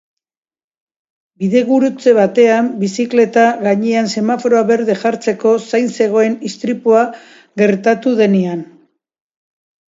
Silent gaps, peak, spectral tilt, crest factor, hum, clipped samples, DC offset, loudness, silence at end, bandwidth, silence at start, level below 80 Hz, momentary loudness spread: none; 0 dBFS; -6 dB/octave; 14 dB; none; under 0.1%; under 0.1%; -14 LUFS; 1.25 s; 7.8 kHz; 1.4 s; -64 dBFS; 7 LU